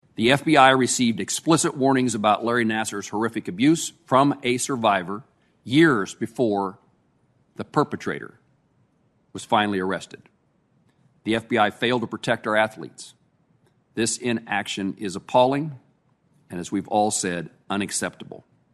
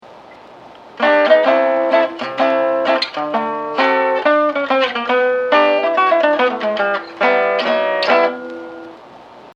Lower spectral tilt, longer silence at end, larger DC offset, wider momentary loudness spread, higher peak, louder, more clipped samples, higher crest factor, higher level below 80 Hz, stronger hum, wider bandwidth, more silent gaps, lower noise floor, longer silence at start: about the same, -4 dB/octave vs -4.5 dB/octave; first, 0.35 s vs 0.05 s; neither; first, 16 LU vs 7 LU; about the same, 0 dBFS vs 0 dBFS; second, -22 LUFS vs -15 LUFS; neither; first, 24 dB vs 16 dB; about the same, -64 dBFS vs -68 dBFS; neither; first, 12.5 kHz vs 7.6 kHz; neither; first, -65 dBFS vs -40 dBFS; first, 0.2 s vs 0.05 s